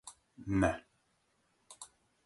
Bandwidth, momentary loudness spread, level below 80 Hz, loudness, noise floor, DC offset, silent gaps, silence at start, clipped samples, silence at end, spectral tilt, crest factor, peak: 11.5 kHz; 21 LU; -54 dBFS; -34 LUFS; -76 dBFS; under 0.1%; none; 0.05 s; under 0.1%; 0.4 s; -6.5 dB/octave; 24 dB; -14 dBFS